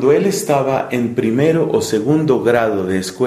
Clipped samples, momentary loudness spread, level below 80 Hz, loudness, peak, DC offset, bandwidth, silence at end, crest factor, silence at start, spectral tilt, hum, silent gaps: under 0.1%; 4 LU; -52 dBFS; -16 LUFS; -2 dBFS; under 0.1%; 15 kHz; 0 s; 12 dB; 0 s; -6 dB/octave; none; none